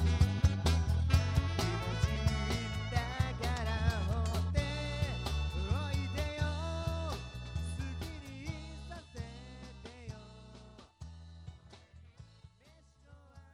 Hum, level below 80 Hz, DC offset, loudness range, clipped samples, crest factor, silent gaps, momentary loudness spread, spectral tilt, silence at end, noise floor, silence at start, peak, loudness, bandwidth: none; -40 dBFS; under 0.1%; 19 LU; under 0.1%; 22 dB; none; 21 LU; -5.5 dB/octave; 0.05 s; -63 dBFS; 0 s; -14 dBFS; -35 LUFS; 15 kHz